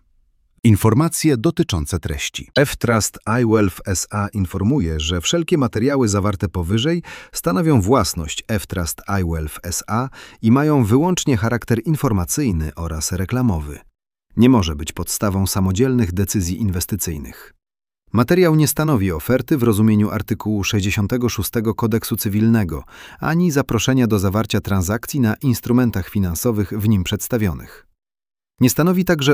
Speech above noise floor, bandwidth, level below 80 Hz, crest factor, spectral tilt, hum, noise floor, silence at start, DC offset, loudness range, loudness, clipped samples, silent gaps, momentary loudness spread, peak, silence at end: 41 dB; 17.5 kHz; -36 dBFS; 16 dB; -5.5 dB/octave; none; -59 dBFS; 0.65 s; under 0.1%; 2 LU; -18 LUFS; under 0.1%; none; 9 LU; -2 dBFS; 0 s